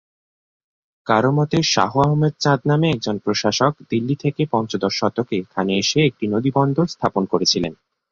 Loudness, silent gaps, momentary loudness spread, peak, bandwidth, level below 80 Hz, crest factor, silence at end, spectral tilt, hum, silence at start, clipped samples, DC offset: -19 LUFS; none; 5 LU; -2 dBFS; 7.6 kHz; -54 dBFS; 18 dB; 0.4 s; -5 dB/octave; none; 1.05 s; under 0.1%; under 0.1%